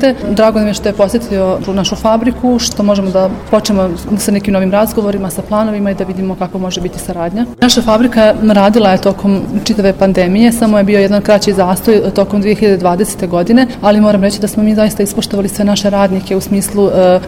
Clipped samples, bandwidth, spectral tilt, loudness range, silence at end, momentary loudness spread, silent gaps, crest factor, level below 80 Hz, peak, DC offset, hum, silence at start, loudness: under 0.1%; 16.5 kHz; -5.5 dB/octave; 4 LU; 0 s; 7 LU; none; 10 dB; -32 dBFS; 0 dBFS; under 0.1%; none; 0 s; -11 LUFS